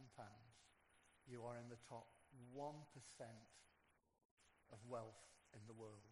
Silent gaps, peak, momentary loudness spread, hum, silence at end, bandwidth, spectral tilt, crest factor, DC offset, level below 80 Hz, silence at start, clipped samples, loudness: 4.25-4.37 s; -40 dBFS; 12 LU; none; 0 s; 11.5 kHz; -5.5 dB/octave; 20 dB; under 0.1%; -86 dBFS; 0 s; under 0.1%; -59 LUFS